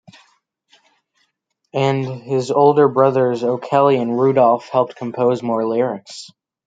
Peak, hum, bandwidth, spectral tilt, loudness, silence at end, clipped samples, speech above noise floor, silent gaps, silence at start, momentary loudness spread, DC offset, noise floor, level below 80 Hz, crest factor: -2 dBFS; none; 9.2 kHz; -7 dB/octave; -17 LUFS; 0.4 s; under 0.1%; 53 dB; none; 1.75 s; 10 LU; under 0.1%; -69 dBFS; -66 dBFS; 16 dB